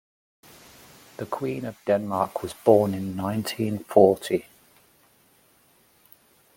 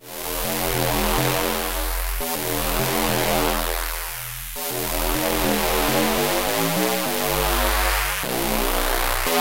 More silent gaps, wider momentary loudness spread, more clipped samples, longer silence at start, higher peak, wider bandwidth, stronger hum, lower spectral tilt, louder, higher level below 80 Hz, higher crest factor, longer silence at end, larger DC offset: neither; first, 13 LU vs 6 LU; neither; first, 1.2 s vs 0 s; about the same, -2 dBFS vs -4 dBFS; about the same, 17 kHz vs 16 kHz; neither; first, -6.5 dB/octave vs -3 dB/octave; about the same, -24 LUFS vs -22 LUFS; second, -64 dBFS vs -30 dBFS; first, 24 dB vs 18 dB; first, 2.15 s vs 0 s; second, under 0.1% vs 0.7%